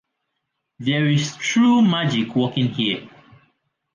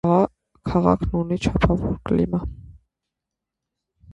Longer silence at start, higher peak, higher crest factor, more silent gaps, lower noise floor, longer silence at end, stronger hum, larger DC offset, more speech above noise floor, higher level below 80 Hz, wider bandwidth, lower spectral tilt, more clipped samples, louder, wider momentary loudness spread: first, 0.8 s vs 0.05 s; second, -6 dBFS vs -2 dBFS; second, 14 dB vs 22 dB; neither; second, -77 dBFS vs -84 dBFS; second, 0.9 s vs 1.4 s; neither; neither; second, 58 dB vs 64 dB; second, -62 dBFS vs -36 dBFS; about the same, 9.4 kHz vs 8.8 kHz; second, -5.5 dB/octave vs -8 dB/octave; neither; about the same, -20 LUFS vs -22 LUFS; about the same, 8 LU vs 8 LU